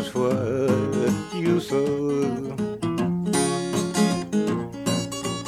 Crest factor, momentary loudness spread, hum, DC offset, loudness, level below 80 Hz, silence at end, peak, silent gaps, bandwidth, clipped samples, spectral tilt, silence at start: 16 dB; 4 LU; none; under 0.1%; -24 LUFS; -54 dBFS; 0 s; -8 dBFS; none; 14.5 kHz; under 0.1%; -5.5 dB/octave; 0 s